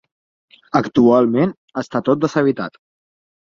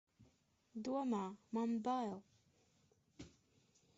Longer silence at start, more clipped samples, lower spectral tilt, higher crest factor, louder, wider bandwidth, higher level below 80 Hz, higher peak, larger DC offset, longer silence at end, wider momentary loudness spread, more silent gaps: first, 0.75 s vs 0.2 s; neither; first, -7.5 dB/octave vs -6 dB/octave; about the same, 16 dB vs 16 dB; first, -17 LUFS vs -42 LUFS; about the same, 7.4 kHz vs 7.6 kHz; first, -58 dBFS vs -80 dBFS; first, -2 dBFS vs -30 dBFS; neither; about the same, 0.75 s vs 0.7 s; second, 13 LU vs 21 LU; first, 1.57-1.68 s vs none